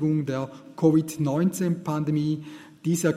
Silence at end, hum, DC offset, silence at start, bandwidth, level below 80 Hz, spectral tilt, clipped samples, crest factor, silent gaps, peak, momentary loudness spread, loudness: 0 s; none; under 0.1%; 0 s; 15.5 kHz; -66 dBFS; -7 dB/octave; under 0.1%; 18 dB; none; -8 dBFS; 11 LU; -25 LUFS